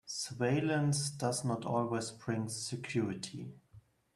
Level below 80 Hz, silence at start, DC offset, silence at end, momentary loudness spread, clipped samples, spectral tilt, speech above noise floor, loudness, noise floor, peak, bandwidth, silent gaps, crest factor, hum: -70 dBFS; 0.05 s; under 0.1%; 0.35 s; 10 LU; under 0.1%; -5 dB/octave; 27 dB; -35 LUFS; -62 dBFS; -18 dBFS; 13 kHz; none; 18 dB; none